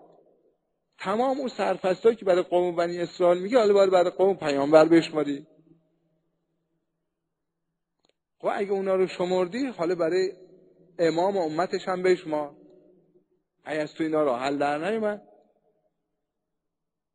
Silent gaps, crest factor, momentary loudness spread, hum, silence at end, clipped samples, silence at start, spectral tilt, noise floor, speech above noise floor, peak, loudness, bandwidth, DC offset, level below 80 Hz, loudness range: none; 22 dB; 12 LU; none; 1.95 s; under 0.1%; 1 s; -6 dB/octave; -84 dBFS; 60 dB; -4 dBFS; -25 LUFS; 11 kHz; under 0.1%; -72 dBFS; 8 LU